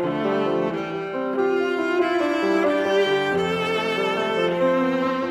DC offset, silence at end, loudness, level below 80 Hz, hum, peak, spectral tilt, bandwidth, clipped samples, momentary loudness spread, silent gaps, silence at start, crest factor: under 0.1%; 0 s; -22 LUFS; -60 dBFS; none; -10 dBFS; -5.5 dB/octave; 14.5 kHz; under 0.1%; 4 LU; none; 0 s; 12 dB